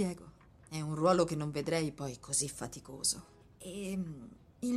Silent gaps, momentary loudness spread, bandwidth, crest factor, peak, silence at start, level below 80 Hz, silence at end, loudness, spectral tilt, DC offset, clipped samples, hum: none; 17 LU; 15 kHz; 22 dB; -14 dBFS; 0 s; -62 dBFS; 0 s; -35 LUFS; -4.5 dB/octave; under 0.1%; under 0.1%; none